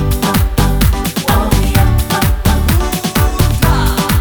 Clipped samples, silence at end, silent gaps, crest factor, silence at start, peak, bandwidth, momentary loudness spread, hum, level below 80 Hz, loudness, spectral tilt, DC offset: under 0.1%; 0 s; none; 10 dB; 0 s; 0 dBFS; over 20 kHz; 2 LU; none; -16 dBFS; -13 LUFS; -5 dB/octave; 0.5%